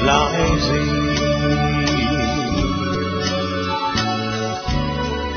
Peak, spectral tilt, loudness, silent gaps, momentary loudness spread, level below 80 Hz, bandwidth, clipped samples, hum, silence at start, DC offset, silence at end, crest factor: 0 dBFS; -5 dB/octave; -19 LUFS; none; 5 LU; -30 dBFS; 6.6 kHz; under 0.1%; none; 0 s; under 0.1%; 0 s; 18 dB